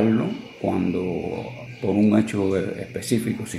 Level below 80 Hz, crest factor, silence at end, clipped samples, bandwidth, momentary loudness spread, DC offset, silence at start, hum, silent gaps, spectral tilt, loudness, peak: -56 dBFS; 16 dB; 0 s; under 0.1%; 13.5 kHz; 11 LU; under 0.1%; 0 s; none; none; -6.5 dB/octave; -24 LUFS; -6 dBFS